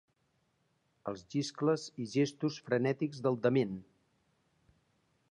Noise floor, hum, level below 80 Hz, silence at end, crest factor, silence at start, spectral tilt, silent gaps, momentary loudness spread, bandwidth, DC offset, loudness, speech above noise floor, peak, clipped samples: -77 dBFS; none; -76 dBFS; 1.5 s; 20 dB; 1.05 s; -6 dB/octave; none; 13 LU; 10.5 kHz; under 0.1%; -34 LUFS; 44 dB; -16 dBFS; under 0.1%